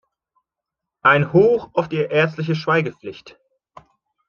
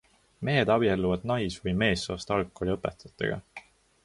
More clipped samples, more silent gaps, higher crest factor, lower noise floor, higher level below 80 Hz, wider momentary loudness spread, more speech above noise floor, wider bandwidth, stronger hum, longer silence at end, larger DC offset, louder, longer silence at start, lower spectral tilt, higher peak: neither; neither; about the same, 20 dB vs 18 dB; first, -84 dBFS vs -50 dBFS; second, -60 dBFS vs -48 dBFS; about the same, 13 LU vs 12 LU; first, 66 dB vs 23 dB; second, 7 kHz vs 11.5 kHz; neither; first, 1 s vs 0.45 s; neither; first, -18 LUFS vs -28 LUFS; first, 1.05 s vs 0.4 s; first, -7.5 dB/octave vs -6 dB/octave; first, -2 dBFS vs -10 dBFS